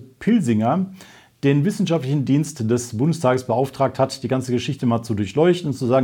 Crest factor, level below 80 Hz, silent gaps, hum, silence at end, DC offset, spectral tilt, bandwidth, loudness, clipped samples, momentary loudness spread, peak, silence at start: 16 dB; -58 dBFS; none; none; 0 s; under 0.1%; -7 dB/octave; 17 kHz; -20 LUFS; under 0.1%; 5 LU; -4 dBFS; 0 s